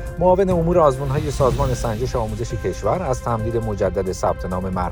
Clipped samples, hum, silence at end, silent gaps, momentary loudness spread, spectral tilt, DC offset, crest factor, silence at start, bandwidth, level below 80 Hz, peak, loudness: under 0.1%; none; 0 s; none; 8 LU; -7 dB/octave; under 0.1%; 16 dB; 0 s; over 20 kHz; -30 dBFS; -2 dBFS; -20 LUFS